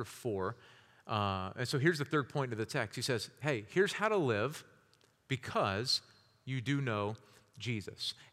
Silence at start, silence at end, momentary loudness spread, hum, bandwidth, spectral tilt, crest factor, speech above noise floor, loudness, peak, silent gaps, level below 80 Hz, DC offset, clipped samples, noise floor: 0 s; 0.1 s; 10 LU; none; 15.5 kHz; -5 dB/octave; 20 dB; 34 dB; -35 LUFS; -16 dBFS; none; -78 dBFS; under 0.1%; under 0.1%; -69 dBFS